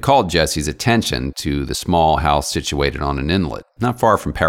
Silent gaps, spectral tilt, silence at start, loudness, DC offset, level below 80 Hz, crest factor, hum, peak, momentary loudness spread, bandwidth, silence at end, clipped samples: none; -4.5 dB/octave; 0 s; -18 LUFS; under 0.1%; -30 dBFS; 16 dB; none; 0 dBFS; 7 LU; 17 kHz; 0 s; under 0.1%